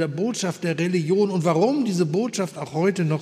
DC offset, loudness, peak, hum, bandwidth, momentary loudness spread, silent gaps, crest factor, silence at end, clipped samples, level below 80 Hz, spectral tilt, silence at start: under 0.1%; -23 LUFS; -8 dBFS; none; 14 kHz; 5 LU; none; 14 dB; 0 s; under 0.1%; -72 dBFS; -6 dB/octave; 0 s